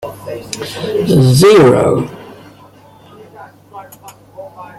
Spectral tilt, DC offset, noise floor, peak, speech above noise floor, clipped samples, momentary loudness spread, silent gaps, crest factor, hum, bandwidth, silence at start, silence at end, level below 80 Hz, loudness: -6 dB/octave; under 0.1%; -41 dBFS; 0 dBFS; 32 dB; under 0.1%; 27 LU; none; 14 dB; none; 15.5 kHz; 0 s; 0.15 s; -46 dBFS; -10 LUFS